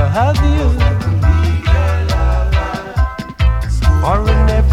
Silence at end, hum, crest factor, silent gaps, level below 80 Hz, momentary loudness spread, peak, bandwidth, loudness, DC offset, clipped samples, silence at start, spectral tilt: 0 s; none; 12 dB; none; -14 dBFS; 5 LU; 0 dBFS; 11 kHz; -15 LUFS; under 0.1%; under 0.1%; 0 s; -7 dB/octave